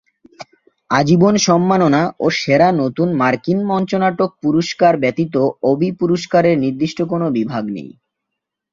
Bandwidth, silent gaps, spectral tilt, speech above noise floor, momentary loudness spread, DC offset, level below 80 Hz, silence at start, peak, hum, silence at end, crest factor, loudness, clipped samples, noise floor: 7.6 kHz; none; -6 dB/octave; 64 dB; 7 LU; under 0.1%; -54 dBFS; 0.4 s; -2 dBFS; none; 0.85 s; 14 dB; -16 LUFS; under 0.1%; -79 dBFS